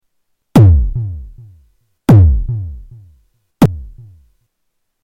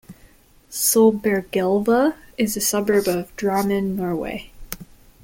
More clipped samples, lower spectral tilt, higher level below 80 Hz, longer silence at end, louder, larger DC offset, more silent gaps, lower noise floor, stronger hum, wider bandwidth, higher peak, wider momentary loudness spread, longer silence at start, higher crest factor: neither; first, -9 dB/octave vs -4 dB/octave; first, -22 dBFS vs -48 dBFS; first, 1.1 s vs 0.4 s; first, -12 LUFS vs -20 LUFS; neither; neither; first, -68 dBFS vs -51 dBFS; neither; about the same, 15.5 kHz vs 17 kHz; first, 0 dBFS vs -4 dBFS; about the same, 19 LU vs 17 LU; first, 0.55 s vs 0.1 s; about the same, 14 dB vs 16 dB